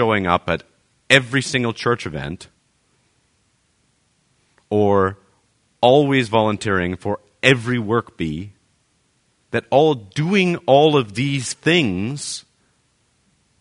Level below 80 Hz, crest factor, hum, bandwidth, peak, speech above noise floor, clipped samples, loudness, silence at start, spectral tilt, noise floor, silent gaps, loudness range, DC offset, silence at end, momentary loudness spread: -52 dBFS; 20 dB; none; 11 kHz; 0 dBFS; 46 dB; under 0.1%; -18 LUFS; 0 s; -5 dB/octave; -64 dBFS; none; 7 LU; under 0.1%; 1.2 s; 13 LU